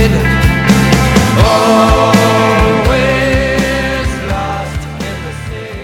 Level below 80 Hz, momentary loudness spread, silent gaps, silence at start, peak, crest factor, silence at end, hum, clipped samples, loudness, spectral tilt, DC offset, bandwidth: -20 dBFS; 13 LU; none; 0 s; 0 dBFS; 10 dB; 0 s; none; 0.2%; -11 LUFS; -5.5 dB/octave; under 0.1%; 17.5 kHz